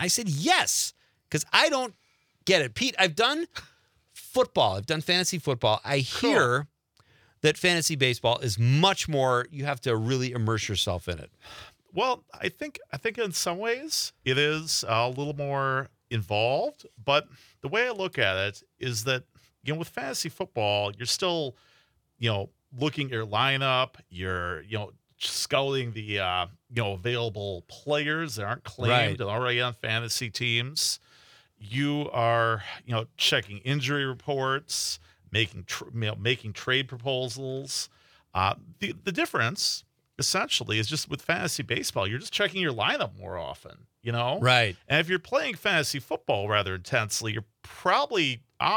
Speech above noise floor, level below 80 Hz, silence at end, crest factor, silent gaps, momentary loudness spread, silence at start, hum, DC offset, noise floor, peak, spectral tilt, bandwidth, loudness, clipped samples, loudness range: 38 dB; -64 dBFS; 0 s; 26 dB; none; 11 LU; 0 s; none; under 0.1%; -65 dBFS; -2 dBFS; -3.5 dB/octave; 19.5 kHz; -27 LUFS; under 0.1%; 5 LU